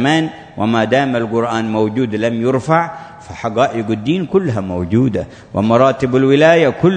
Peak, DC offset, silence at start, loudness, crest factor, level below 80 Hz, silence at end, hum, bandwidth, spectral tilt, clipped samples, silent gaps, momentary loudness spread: 0 dBFS; under 0.1%; 0 s; -15 LUFS; 14 dB; -48 dBFS; 0 s; none; 9.4 kHz; -7 dB/octave; under 0.1%; none; 12 LU